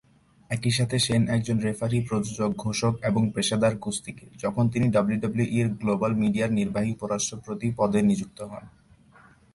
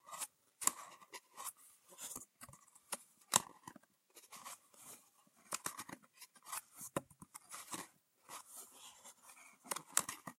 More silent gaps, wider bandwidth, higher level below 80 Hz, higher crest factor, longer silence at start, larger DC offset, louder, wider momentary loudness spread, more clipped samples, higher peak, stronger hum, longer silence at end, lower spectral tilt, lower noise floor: neither; second, 11.5 kHz vs 16.5 kHz; first, -54 dBFS vs -84 dBFS; second, 16 dB vs 42 dB; first, 0.5 s vs 0.05 s; neither; first, -26 LUFS vs -43 LUFS; second, 9 LU vs 21 LU; neither; second, -10 dBFS vs -6 dBFS; neither; first, 0.85 s vs 0.05 s; first, -5.5 dB/octave vs -0.5 dB/octave; second, -55 dBFS vs -69 dBFS